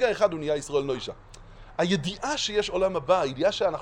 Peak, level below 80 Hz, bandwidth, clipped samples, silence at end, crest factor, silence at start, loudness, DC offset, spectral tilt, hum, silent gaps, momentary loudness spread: -8 dBFS; -50 dBFS; 11 kHz; under 0.1%; 0 s; 18 dB; 0 s; -26 LUFS; under 0.1%; -4.5 dB/octave; none; none; 9 LU